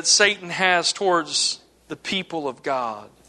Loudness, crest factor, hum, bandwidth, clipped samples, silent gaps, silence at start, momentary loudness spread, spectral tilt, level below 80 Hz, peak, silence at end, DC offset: -21 LUFS; 22 dB; none; 12.5 kHz; under 0.1%; none; 0 s; 14 LU; -1 dB/octave; -66 dBFS; -2 dBFS; 0.2 s; under 0.1%